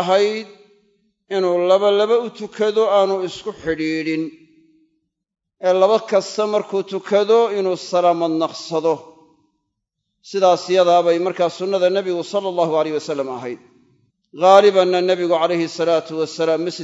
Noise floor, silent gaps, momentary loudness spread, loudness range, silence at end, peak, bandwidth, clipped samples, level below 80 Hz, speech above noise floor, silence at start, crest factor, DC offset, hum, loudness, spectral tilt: -76 dBFS; none; 10 LU; 4 LU; 0 s; 0 dBFS; 8 kHz; under 0.1%; -64 dBFS; 59 dB; 0 s; 18 dB; under 0.1%; none; -18 LUFS; -5 dB/octave